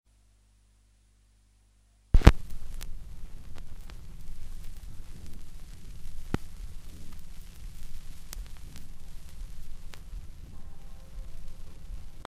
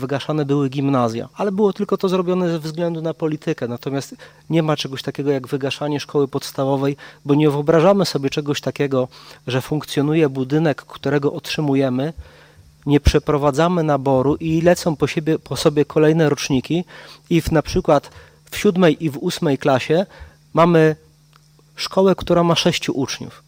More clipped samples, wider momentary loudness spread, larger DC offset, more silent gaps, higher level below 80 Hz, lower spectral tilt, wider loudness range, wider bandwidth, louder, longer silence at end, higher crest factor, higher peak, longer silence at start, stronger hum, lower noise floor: neither; first, 12 LU vs 9 LU; neither; neither; about the same, -34 dBFS vs -38 dBFS; about the same, -6.5 dB/octave vs -6 dB/octave; first, 18 LU vs 4 LU; second, 14 kHz vs 16.5 kHz; second, -29 LUFS vs -19 LUFS; about the same, 0.05 s vs 0.1 s; first, 30 dB vs 16 dB; about the same, 0 dBFS vs -2 dBFS; first, 2.15 s vs 0 s; first, 50 Hz at -55 dBFS vs none; first, -63 dBFS vs -52 dBFS